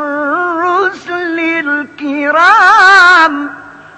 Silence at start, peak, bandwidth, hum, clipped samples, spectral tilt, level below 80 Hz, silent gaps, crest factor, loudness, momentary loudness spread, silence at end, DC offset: 0 s; 0 dBFS; 11 kHz; none; 0.9%; -2 dB/octave; -54 dBFS; none; 10 dB; -8 LUFS; 14 LU; 0.25 s; under 0.1%